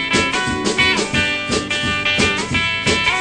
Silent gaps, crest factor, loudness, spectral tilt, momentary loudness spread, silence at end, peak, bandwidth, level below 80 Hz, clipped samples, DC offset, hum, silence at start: none; 16 dB; -16 LUFS; -3 dB/octave; 4 LU; 0 s; -2 dBFS; 11 kHz; -40 dBFS; under 0.1%; under 0.1%; none; 0 s